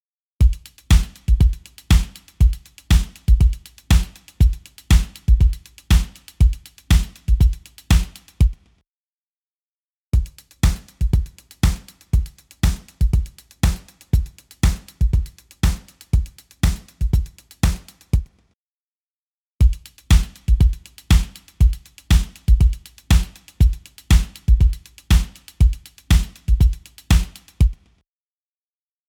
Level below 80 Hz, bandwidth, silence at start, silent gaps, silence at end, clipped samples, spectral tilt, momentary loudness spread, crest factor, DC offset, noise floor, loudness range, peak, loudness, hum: -20 dBFS; 16.5 kHz; 0.4 s; 8.88-10.11 s, 18.54-19.58 s; 1.35 s; under 0.1%; -5.5 dB/octave; 15 LU; 16 dB; under 0.1%; under -90 dBFS; 5 LU; -2 dBFS; -20 LUFS; none